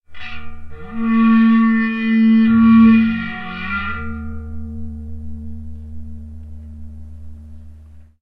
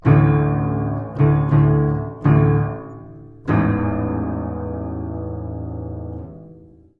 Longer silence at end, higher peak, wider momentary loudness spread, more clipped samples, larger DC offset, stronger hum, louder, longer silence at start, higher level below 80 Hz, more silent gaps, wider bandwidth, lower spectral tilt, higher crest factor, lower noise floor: second, 0.15 s vs 0.4 s; about the same, -2 dBFS vs -2 dBFS; first, 25 LU vs 17 LU; neither; neither; neither; first, -14 LUFS vs -20 LUFS; about the same, 0.1 s vs 0.05 s; about the same, -38 dBFS vs -38 dBFS; neither; first, 4.7 kHz vs 3.6 kHz; second, -9 dB/octave vs -12 dB/octave; about the same, 14 dB vs 18 dB; second, -41 dBFS vs -45 dBFS